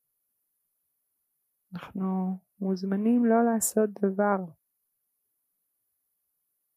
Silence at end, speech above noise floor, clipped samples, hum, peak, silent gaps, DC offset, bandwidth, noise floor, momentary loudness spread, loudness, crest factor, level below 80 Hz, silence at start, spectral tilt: 2.25 s; 53 dB; under 0.1%; none; -12 dBFS; none; under 0.1%; 15.5 kHz; -79 dBFS; 17 LU; -27 LUFS; 18 dB; -76 dBFS; 1.7 s; -6 dB/octave